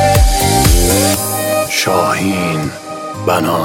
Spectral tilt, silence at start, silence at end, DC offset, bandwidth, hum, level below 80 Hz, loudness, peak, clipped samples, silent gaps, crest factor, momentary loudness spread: -4 dB/octave; 0 s; 0 s; under 0.1%; 17 kHz; none; -20 dBFS; -13 LUFS; 0 dBFS; under 0.1%; none; 12 dB; 10 LU